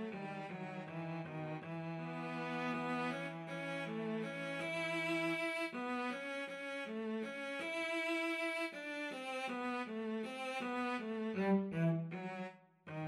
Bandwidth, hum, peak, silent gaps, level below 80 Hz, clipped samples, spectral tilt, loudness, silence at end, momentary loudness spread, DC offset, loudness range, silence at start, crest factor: 14 kHz; none; -24 dBFS; none; -86 dBFS; under 0.1%; -6 dB/octave; -41 LUFS; 0 s; 8 LU; under 0.1%; 3 LU; 0 s; 16 dB